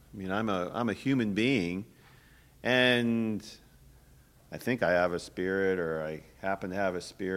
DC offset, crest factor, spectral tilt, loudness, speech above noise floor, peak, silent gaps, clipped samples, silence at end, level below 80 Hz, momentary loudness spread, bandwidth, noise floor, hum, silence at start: under 0.1%; 22 dB; -5.5 dB/octave; -30 LUFS; 29 dB; -10 dBFS; none; under 0.1%; 0 s; -60 dBFS; 13 LU; 16 kHz; -59 dBFS; none; 0.15 s